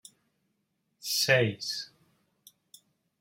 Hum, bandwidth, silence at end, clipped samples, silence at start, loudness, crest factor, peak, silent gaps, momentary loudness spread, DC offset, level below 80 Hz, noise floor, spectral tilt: none; 16 kHz; 1.35 s; under 0.1%; 1.05 s; -27 LUFS; 24 dB; -10 dBFS; none; 17 LU; under 0.1%; -76 dBFS; -78 dBFS; -3 dB/octave